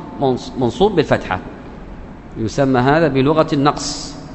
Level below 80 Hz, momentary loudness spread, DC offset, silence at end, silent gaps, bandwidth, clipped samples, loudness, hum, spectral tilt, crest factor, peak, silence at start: -38 dBFS; 21 LU; under 0.1%; 0 s; none; 8.4 kHz; under 0.1%; -17 LUFS; none; -6 dB/octave; 18 dB; 0 dBFS; 0 s